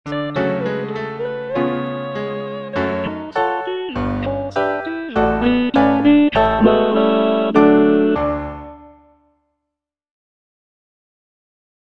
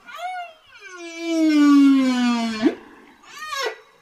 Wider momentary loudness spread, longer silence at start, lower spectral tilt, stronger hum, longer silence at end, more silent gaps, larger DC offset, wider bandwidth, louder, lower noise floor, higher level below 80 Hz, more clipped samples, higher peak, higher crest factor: second, 12 LU vs 23 LU; about the same, 0.05 s vs 0.1 s; first, -8 dB/octave vs -3.5 dB/octave; neither; first, 3.05 s vs 0.3 s; neither; neither; second, 6.4 kHz vs 12.5 kHz; about the same, -17 LUFS vs -19 LUFS; first, -81 dBFS vs -46 dBFS; first, -40 dBFS vs -66 dBFS; neither; first, 0 dBFS vs -6 dBFS; about the same, 18 dB vs 14 dB